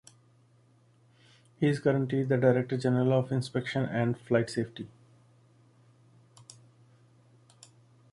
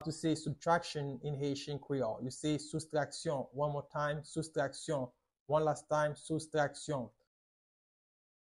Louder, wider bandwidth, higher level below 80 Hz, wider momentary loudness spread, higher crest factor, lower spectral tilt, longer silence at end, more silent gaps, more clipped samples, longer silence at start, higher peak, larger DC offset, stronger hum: first, -29 LUFS vs -37 LUFS; about the same, 11.5 kHz vs 11.5 kHz; about the same, -68 dBFS vs -68 dBFS; about the same, 9 LU vs 7 LU; about the same, 20 dB vs 20 dB; first, -7.5 dB/octave vs -5.5 dB/octave; first, 3.25 s vs 1.5 s; second, none vs 5.40-5.46 s; neither; first, 1.6 s vs 0 s; first, -12 dBFS vs -18 dBFS; neither; neither